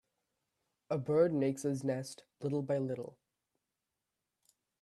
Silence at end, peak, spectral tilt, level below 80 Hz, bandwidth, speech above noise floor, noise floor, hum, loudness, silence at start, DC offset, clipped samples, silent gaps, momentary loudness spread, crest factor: 1.7 s; -18 dBFS; -7 dB/octave; -78 dBFS; 13 kHz; 54 dB; -89 dBFS; none; -35 LUFS; 0.9 s; under 0.1%; under 0.1%; none; 13 LU; 20 dB